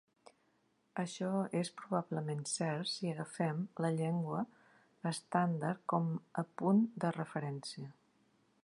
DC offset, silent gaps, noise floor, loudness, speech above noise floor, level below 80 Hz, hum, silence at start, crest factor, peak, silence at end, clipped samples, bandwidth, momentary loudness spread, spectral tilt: under 0.1%; none; -76 dBFS; -37 LUFS; 39 dB; -84 dBFS; none; 0.95 s; 20 dB; -16 dBFS; 0.7 s; under 0.1%; 11 kHz; 9 LU; -6 dB/octave